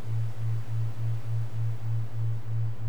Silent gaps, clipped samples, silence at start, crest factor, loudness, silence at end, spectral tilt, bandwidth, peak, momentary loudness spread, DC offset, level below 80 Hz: none; under 0.1%; 0 s; 8 dB; -33 LUFS; 0 s; -8 dB/octave; 6.2 kHz; -20 dBFS; 2 LU; 4%; -56 dBFS